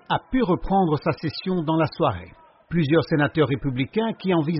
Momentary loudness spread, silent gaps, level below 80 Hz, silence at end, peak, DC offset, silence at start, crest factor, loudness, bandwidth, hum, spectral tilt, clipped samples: 5 LU; none; -44 dBFS; 0 s; -6 dBFS; under 0.1%; 0.1 s; 16 dB; -23 LUFS; 5.8 kHz; none; -6 dB/octave; under 0.1%